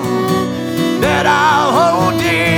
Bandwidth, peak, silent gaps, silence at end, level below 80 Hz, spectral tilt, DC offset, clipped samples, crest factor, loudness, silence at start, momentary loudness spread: 19 kHz; -2 dBFS; none; 0 s; -42 dBFS; -5 dB/octave; under 0.1%; under 0.1%; 12 dB; -13 LUFS; 0 s; 6 LU